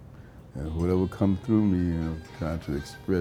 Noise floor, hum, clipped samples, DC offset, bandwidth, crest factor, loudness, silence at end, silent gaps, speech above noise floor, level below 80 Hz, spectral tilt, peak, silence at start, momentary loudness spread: -47 dBFS; none; under 0.1%; under 0.1%; 14 kHz; 18 dB; -28 LUFS; 0 s; none; 20 dB; -42 dBFS; -8.5 dB/octave; -10 dBFS; 0 s; 15 LU